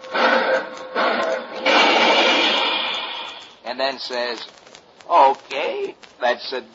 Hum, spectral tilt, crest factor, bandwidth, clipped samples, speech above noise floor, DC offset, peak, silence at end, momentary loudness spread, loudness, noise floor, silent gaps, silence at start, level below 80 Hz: none; -1.5 dB/octave; 18 dB; 8 kHz; under 0.1%; 24 dB; under 0.1%; -2 dBFS; 0.1 s; 16 LU; -19 LUFS; -46 dBFS; none; 0 s; -74 dBFS